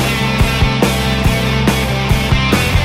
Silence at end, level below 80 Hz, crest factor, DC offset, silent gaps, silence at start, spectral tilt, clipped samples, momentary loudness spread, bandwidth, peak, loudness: 0 s; -20 dBFS; 14 dB; under 0.1%; none; 0 s; -5 dB/octave; under 0.1%; 2 LU; 16.5 kHz; 0 dBFS; -14 LUFS